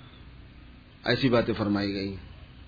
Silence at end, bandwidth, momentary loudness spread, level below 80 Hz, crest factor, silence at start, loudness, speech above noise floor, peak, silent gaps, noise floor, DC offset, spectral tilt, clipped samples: 0 s; 5 kHz; 21 LU; -50 dBFS; 18 dB; 0 s; -27 LUFS; 24 dB; -10 dBFS; none; -50 dBFS; under 0.1%; -7.5 dB/octave; under 0.1%